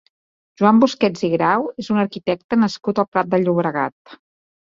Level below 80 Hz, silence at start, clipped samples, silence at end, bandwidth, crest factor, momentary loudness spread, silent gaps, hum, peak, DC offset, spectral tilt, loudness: -60 dBFS; 0.6 s; under 0.1%; 0.6 s; 7.6 kHz; 18 dB; 7 LU; 2.44-2.49 s, 3.08-3.12 s, 3.92-4.05 s; none; -2 dBFS; under 0.1%; -6.5 dB/octave; -19 LUFS